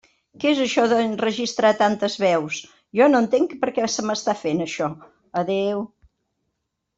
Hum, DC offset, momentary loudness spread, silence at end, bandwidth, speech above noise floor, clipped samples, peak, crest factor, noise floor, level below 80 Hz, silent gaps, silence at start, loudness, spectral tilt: none; under 0.1%; 11 LU; 1.1 s; 8 kHz; 56 dB; under 0.1%; -4 dBFS; 18 dB; -77 dBFS; -64 dBFS; none; 0.4 s; -21 LUFS; -4.5 dB/octave